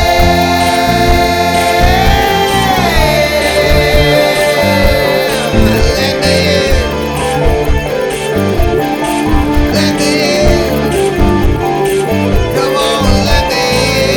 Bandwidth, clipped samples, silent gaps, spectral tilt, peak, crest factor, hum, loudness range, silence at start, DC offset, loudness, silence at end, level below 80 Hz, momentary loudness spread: over 20 kHz; 0.2%; none; -4.5 dB/octave; 0 dBFS; 10 dB; none; 3 LU; 0 s; under 0.1%; -11 LUFS; 0 s; -18 dBFS; 4 LU